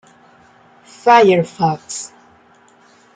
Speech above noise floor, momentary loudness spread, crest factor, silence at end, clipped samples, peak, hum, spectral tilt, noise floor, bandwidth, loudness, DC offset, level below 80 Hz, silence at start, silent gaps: 36 dB; 18 LU; 16 dB; 1.1 s; under 0.1%; -2 dBFS; none; -5 dB/octave; -50 dBFS; 9.6 kHz; -14 LUFS; under 0.1%; -64 dBFS; 1.05 s; none